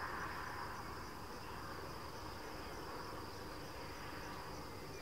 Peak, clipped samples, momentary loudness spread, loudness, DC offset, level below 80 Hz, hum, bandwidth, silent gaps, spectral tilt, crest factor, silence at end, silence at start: -32 dBFS; under 0.1%; 4 LU; -48 LUFS; 0.2%; -60 dBFS; none; 16 kHz; none; -4 dB/octave; 16 dB; 0 s; 0 s